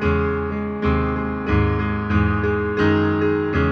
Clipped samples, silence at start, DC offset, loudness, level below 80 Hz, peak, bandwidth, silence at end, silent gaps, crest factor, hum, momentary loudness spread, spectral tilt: under 0.1%; 0 s; under 0.1%; -20 LUFS; -30 dBFS; -6 dBFS; 6.4 kHz; 0 s; none; 14 dB; none; 5 LU; -9 dB/octave